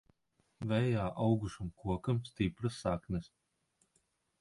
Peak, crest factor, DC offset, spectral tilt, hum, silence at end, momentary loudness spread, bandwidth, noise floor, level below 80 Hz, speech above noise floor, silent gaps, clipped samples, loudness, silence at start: -20 dBFS; 18 dB; under 0.1%; -7.5 dB/octave; none; 1.2 s; 9 LU; 11.5 kHz; -78 dBFS; -54 dBFS; 43 dB; none; under 0.1%; -36 LUFS; 0.6 s